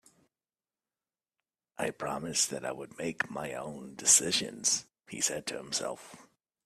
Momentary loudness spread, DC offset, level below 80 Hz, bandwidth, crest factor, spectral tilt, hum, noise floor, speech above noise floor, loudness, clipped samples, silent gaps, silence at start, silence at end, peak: 17 LU; under 0.1%; -72 dBFS; 15.5 kHz; 28 dB; -1 dB/octave; none; under -90 dBFS; over 57 dB; -30 LUFS; under 0.1%; none; 1.8 s; 0.4 s; -8 dBFS